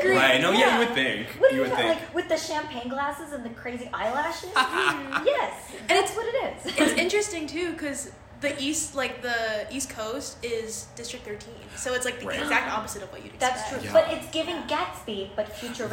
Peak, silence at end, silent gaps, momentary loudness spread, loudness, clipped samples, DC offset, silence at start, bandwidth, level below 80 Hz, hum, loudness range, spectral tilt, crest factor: -6 dBFS; 0 s; none; 14 LU; -26 LUFS; under 0.1%; under 0.1%; 0 s; 16.5 kHz; -56 dBFS; none; 5 LU; -2.5 dB/octave; 20 dB